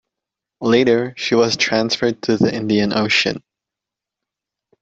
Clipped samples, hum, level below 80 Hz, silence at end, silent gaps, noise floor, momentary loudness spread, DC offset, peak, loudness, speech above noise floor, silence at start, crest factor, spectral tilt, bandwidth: under 0.1%; none; -56 dBFS; 1.45 s; none; -85 dBFS; 4 LU; under 0.1%; -2 dBFS; -17 LUFS; 69 dB; 0.6 s; 16 dB; -4.5 dB/octave; 8 kHz